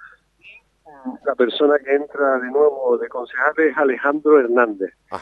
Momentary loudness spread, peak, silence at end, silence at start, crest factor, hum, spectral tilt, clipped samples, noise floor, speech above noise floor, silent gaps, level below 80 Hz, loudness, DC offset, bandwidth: 12 LU; -2 dBFS; 0 s; 0 s; 16 dB; none; -6 dB/octave; under 0.1%; -48 dBFS; 30 dB; none; -66 dBFS; -18 LUFS; under 0.1%; 5.2 kHz